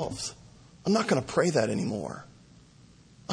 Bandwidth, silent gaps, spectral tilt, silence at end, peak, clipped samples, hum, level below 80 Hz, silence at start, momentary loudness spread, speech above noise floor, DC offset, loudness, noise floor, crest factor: 10.5 kHz; none; -5 dB/octave; 0 s; -10 dBFS; under 0.1%; none; -60 dBFS; 0 s; 14 LU; 28 dB; under 0.1%; -28 LUFS; -55 dBFS; 20 dB